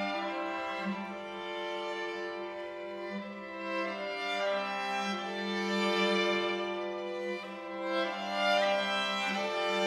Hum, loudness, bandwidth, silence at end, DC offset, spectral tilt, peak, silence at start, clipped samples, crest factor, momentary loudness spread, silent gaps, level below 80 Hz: none; -33 LUFS; 14 kHz; 0 s; under 0.1%; -4 dB/octave; -16 dBFS; 0 s; under 0.1%; 16 dB; 12 LU; none; -78 dBFS